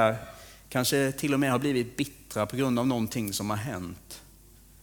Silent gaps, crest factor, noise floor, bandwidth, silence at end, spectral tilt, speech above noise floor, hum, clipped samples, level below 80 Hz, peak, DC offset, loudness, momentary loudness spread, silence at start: none; 20 dB; -54 dBFS; over 20 kHz; 0.6 s; -5 dB/octave; 26 dB; none; under 0.1%; -56 dBFS; -8 dBFS; under 0.1%; -28 LUFS; 18 LU; 0 s